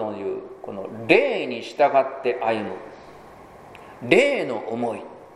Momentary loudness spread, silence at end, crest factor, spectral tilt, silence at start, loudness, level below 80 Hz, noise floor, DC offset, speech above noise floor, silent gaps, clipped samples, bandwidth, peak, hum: 18 LU; 0 s; 24 dB; -5 dB/octave; 0 s; -22 LUFS; -64 dBFS; -45 dBFS; under 0.1%; 23 dB; none; under 0.1%; 12 kHz; 0 dBFS; none